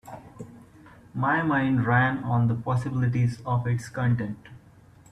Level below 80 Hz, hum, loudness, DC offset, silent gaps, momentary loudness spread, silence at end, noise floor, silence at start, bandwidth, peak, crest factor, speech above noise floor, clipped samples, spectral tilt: -56 dBFS; none; -25 LUFS; under 0.1%; none; 20 LU; 0.55 s; -53 dBFS; 0.05 s; 10 kHz; -10 dBFS; 16 dB; 28 dB; under 0.1%; -8 dB/octave